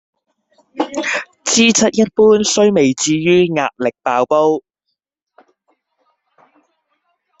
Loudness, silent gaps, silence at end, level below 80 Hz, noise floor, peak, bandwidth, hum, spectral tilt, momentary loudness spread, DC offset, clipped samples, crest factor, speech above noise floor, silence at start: -14 LUFS; none; 2.8 s; -56 dBFS; -75 dBFS; 0 dBFS; 8.4 kHz; none; -3.5 dB/octave; 9 LU; under 0.1%; under 0.1%; 16 dB; 61 dB; 0.75 s